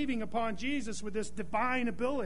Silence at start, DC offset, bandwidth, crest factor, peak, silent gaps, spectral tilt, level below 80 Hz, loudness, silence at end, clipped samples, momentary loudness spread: 0 s; 1%; 10.5 kHz; 16 dB; -18 dBFS; none; -4.5 dB/octave; -54 dBFS; -34 LUFS; 0 s; under 0.1%; 6 LU